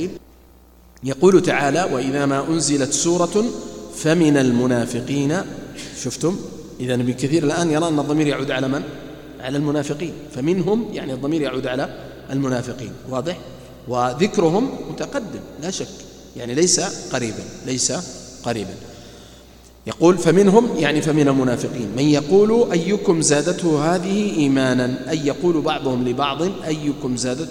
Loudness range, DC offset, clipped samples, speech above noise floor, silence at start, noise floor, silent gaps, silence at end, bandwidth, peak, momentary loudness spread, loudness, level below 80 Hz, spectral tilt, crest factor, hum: 6 LU; under 0.1%; under 0.1%; 29 dB; 0 s; -48 dBFS; none; 0 s; 16.5 kHz; 0 dBFS; 16 LU; -19 LUFS; -50 dBFS; -5 dB/octave; 20 dB; none